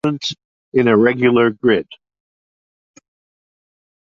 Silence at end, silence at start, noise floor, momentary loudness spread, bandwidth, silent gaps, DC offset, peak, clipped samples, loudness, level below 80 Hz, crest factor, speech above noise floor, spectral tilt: 2.1 s; 0.05 s; under -90 dBFS; 14 LU; 7.6 kHz; 0.45-0.72 s; under 0.1%; -2 dBFS; under 0.1%; -16 LUFS; -58 dBFS; 16 dB; over 75 dB; -6 dB/octave